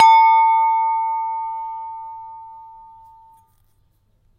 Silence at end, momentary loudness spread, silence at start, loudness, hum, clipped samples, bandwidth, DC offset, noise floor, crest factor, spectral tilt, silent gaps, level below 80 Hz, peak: 1.7 s; 25 LU; 0 s; -17 LUFS; none; under 0.1%; 7 kHz; under 0.1%; -61 dBFS; 18 dB; 1.5 dB/octave; none; -62 dBFS; 0 dBFS